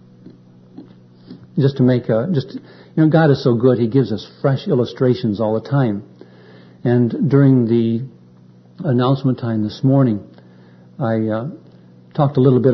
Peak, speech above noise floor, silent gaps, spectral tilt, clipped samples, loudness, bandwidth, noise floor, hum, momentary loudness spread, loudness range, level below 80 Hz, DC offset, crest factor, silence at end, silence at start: 0 dBFS; 30 dB; none; -10 dB/octave; under 0.1%; -17 LUFS; 6 kHz; -46 dBFS; none; 12 LU; 3 LU; -58 dBFS; under 0.1%; 18 dB; 0 s; 0.8 s